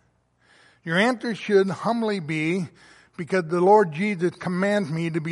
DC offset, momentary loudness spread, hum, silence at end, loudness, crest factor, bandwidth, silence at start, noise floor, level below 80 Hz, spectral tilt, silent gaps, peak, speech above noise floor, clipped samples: under 0.1%; 10 LU; none; 0 s; -23 LUFS; 18 dB; 11.5 kHz; 0.85 s; -64 dBFS; -70 dBFS; -6.5 dB/octave; none; -6 dBFS; 41 dB; under 0.1%